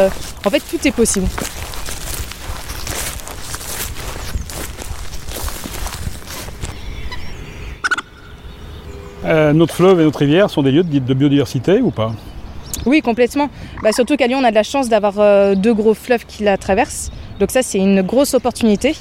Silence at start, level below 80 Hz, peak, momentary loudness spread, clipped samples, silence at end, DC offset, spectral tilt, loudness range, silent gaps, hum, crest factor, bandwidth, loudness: 0 s; -32 dBFS; 0 dBFS; 16 LU; under 0.1%; 0 s; under 0.1%; -5 dB/octave; 12 LU; none; none; 16 dB; 16.5 kHz; -16 LUFS